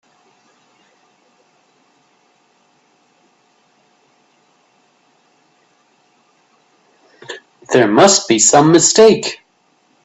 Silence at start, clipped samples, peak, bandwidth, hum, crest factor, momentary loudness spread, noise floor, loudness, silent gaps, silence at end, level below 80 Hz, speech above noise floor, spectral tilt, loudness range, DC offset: 7.3 s; under 0.1%; 0 dBFS; 9.6 kHz; none; 18 dB; 25 LU; -58 dBFS; -10 LUFS; none; 0.7 s; -60 dBFS; 48 dB; -3 dB/octave; 8 LU; under 0.1%